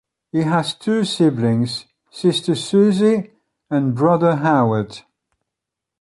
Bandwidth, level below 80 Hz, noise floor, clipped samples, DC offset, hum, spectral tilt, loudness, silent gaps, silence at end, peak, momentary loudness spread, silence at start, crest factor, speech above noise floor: 11.5 kHz; -58 dBFS; -83 dBFS; under 0.1%; under 0.1%; none; -6.5 dB/octave; -18 LUFS; none; 1 s; -2 dBFS; 9 LU; 0.35 s; 16 dB; 66 dB